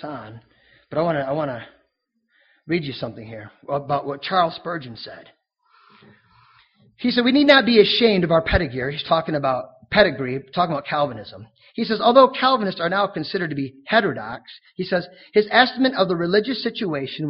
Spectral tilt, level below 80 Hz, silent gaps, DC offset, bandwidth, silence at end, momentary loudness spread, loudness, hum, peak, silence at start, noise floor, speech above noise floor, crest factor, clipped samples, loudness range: -3 dB/octave; -44 dBFS; none; under 0.1%; 5.8 kHz; 0 s; 19 LU; -20 LUFS; none; 0 dBFS; 0.05 s; -72 dBFS; 51 dB; 22 dB; under 0.1%; 10 LU